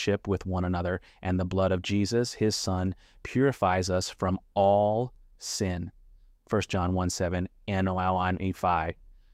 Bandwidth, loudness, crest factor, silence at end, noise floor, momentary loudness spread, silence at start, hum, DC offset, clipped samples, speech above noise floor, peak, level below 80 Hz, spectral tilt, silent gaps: 15 kHz; -28 LUFS; 16 dB; 0.4 s; -56 dBFS; 9 LU; 0 s; none; under 0.1%; under 0.1%; 28 dB; -12 dBFS; -50 dBFS; -5.5 dB/octave; none